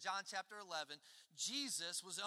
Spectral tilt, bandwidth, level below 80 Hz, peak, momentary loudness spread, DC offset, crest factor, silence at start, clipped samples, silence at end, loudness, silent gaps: 0 dB/octave; 16 kHz; under -90 dBFS; -30 dBFS; 11 LU; under 0.1%; 18 dB; 0 s; under 0.1%; 0 s; -44 LUFS; none